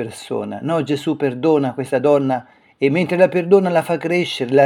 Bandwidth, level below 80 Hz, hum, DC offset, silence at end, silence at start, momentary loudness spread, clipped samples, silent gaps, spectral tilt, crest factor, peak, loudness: 14.5 kHz; -68 dBFS; none; under 0.1%; 0 s; 0 s; 10 LU; under 0.1%; none; -6.5 dB/octave; 18 dB; 0 dBFS; -18 LUFS